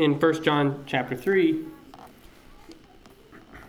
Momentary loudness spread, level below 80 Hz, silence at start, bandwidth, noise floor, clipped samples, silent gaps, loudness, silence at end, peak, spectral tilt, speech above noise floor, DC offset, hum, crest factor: 13 LU; -58 dBFS; 0 s; 15.5 kHz; -52 dBFS; under 0.1%; none; -24 LUFS; 0.05 s; -8 dBFS; -6.5 dB/octave; 28 dB; under 0.1%; none; 18 dB